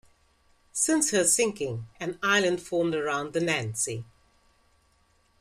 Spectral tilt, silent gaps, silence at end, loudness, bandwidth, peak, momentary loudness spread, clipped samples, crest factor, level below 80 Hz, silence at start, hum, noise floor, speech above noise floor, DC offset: -3 dB/octave; none; 1.35 s; -26 LUFS; 15 kHz; -8 dBFS; 12 LU; under 0.1%; 20 dB; -64 dBFS; 0.75 s; none; -66 dBFS; 39 dB; under 0.1%